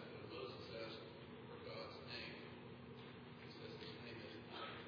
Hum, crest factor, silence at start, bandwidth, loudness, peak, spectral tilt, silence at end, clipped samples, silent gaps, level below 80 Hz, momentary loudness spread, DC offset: none; 16 dB; 0 s; 5.4 kHz; -53 LUFS; -38 dBFS; -3.5 dB/octave; 0 s; under 0.1%; none; -78 dBFS; 6 LU; under 0.1%